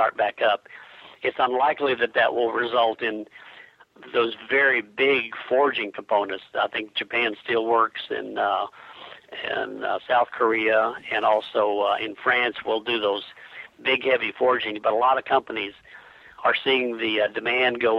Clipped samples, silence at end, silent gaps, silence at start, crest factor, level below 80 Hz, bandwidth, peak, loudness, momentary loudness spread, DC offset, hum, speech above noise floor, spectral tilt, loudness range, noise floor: under 0.1%; 0 s; none; 0 s; 18 dB; -70 dBFS; 11 kHz; -6 dBFS; -23 LUFS; 10 LU; under 0.1%; none; 26 dB; -5.5 dB/octave; 2 LU; -49 dBFS